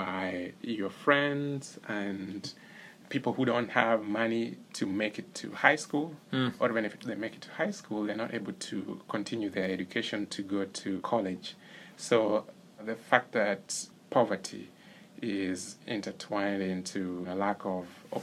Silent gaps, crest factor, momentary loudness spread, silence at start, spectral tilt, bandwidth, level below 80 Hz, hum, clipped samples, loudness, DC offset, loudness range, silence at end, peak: none; 28 dB; 13 LU; 0 s; -4.5 dB/octave; 14.5 kHz; -78 dBFS; none; under 0.1%; -32 LUFS; under 0.1%; 5 LU; 0 s; -6 dBFS